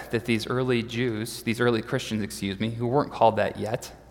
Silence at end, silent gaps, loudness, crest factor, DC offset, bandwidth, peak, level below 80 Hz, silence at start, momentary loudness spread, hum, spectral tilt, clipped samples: 0 s; none; -26 LUFS; 22 dB; under 0.1%; 18 kHz; -6 dBFS; -54 dBFS; 0 s; 8 LU; none; -5.5 dB/octave; under 0.1%